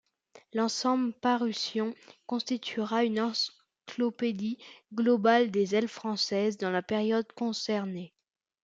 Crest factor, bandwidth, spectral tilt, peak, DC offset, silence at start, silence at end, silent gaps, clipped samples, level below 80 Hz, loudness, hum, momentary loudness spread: 20 dB; 7.8 kHz; -4.5 dB/octave; -10 dBFS; under 0.1%; 0.35 s; 0.6 s; none; under 0.1%; -78 dBFS; -30 LUFS; none; 11 LU